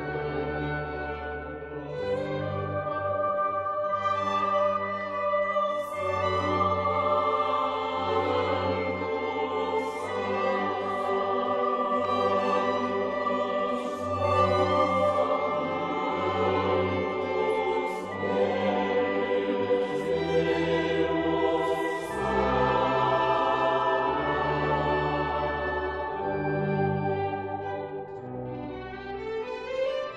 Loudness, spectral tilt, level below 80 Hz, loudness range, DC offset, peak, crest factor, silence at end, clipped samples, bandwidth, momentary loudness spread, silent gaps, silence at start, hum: -27 LUFS; -6.5 dB/octave; -50 dBFS; 5 LU; under 0.1%; -12 dBFS; 16 dB; 0 s; under 0.1%; 12.5 kHz; 9 LU; none; 0 s; none